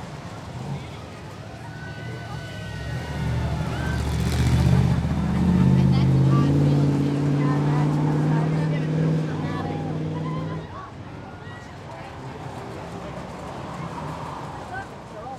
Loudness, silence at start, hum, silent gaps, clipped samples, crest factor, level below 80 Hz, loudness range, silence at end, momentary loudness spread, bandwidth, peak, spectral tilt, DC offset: -24 LUFS; 0 s; none; none; under 0.1%; 16 dB; -36 dBFS; 14 LU; 0 s; 18 LU; 12.5 kHz; -8 dBFS; -7.5 dB/octave; under 0.1%